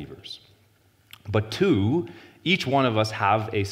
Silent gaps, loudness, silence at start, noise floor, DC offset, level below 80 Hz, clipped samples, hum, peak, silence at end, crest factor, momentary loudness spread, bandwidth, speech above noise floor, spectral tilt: none; -24 LUFS; 0 s; -61 dBFS; under 0.1%; -60 dBFS; under 0.1%; none; -6 dBFS; 0 s; 18 dB; 18 LU; 15.5 kHz; 37 dB; -6 dB/octave